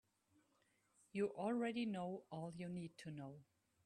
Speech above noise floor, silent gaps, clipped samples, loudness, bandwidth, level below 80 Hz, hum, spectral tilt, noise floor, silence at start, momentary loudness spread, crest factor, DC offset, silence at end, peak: 35 dB; none; under 0.1%; -46 LUFS; 11.5 kHz; -84 dBFS; none; -7 dB/octave; -80 dBFS; 1.15 s; 12 LU; 18 dB; under 0.1%; 0.4 s; -30 dBFS